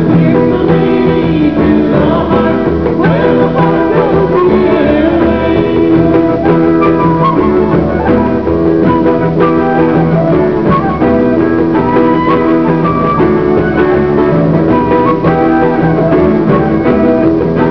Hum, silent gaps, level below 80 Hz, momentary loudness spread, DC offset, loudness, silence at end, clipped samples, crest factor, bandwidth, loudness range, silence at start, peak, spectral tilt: none; none; -28 dBFS; 2 LU; 1%; -9 LUFS; 0 s; 0.4%; 8 dB; 5.4 kHz; 1 LU; 0 s; 0 dBFS; -10 dB/octave